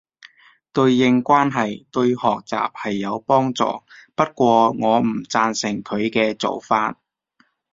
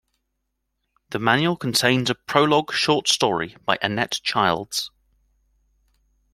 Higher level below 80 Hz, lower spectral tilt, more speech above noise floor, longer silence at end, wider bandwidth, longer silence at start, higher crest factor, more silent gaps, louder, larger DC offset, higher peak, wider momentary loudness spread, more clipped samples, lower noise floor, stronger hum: about the same, -60 dBFS vs -60 dBFS; first, -5.5 dB/octave vs -3.5 dB/octave; second, 44 dB vs 55 dB; second, 0.8 s vs 1.45 s; second, 7.8 kHz vs 16 kHz; second, 0.75 s vs 1.1 s; about the same, 18 dB vs 22 dB; neither; about the same, -19 LUFS vs -21 LUFS; neither; about the same, -2 dBFS vs -2 dBFS; about the same, 9 LU vs 7 LU; neither; second, -63 dBFS vs -77 dBFS; neither